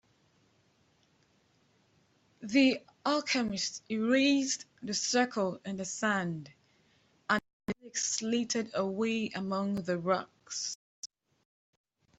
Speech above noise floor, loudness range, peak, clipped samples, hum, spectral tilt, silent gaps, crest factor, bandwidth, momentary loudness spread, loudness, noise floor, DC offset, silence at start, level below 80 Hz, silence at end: 39 dB; 4 LU; -12 dBFS; under 0.1%; none; -3.5 dB/octave; 7.53-7.60 s, 10.75-11.03 s; 22 dB; 8.2 kHz; 14 LU; -32 LUFS; -70 dBFS; under 0.1%; 2.4 s; -72 dBFS; 1.15 s